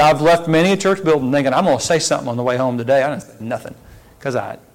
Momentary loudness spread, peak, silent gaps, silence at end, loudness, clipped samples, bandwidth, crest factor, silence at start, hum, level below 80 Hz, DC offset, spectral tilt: 13 LU; -6 dBFS; none; 0.2 s; -17 LUFS; under 0.1%; 16.5 kHz; 10 dB; 0 s; none; -50 dBFS; under 0.1%; -5 dB/octave